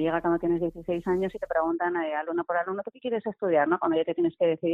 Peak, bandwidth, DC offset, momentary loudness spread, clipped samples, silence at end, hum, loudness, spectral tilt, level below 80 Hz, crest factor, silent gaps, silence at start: -12 dBFS; 3.9 kHz; under 0.1%; 6 LU; under 0.1%; 0 s; none; -27 LUFS; -8.5 dB/octave; -58 dBFS; 16 dB; none; 0 s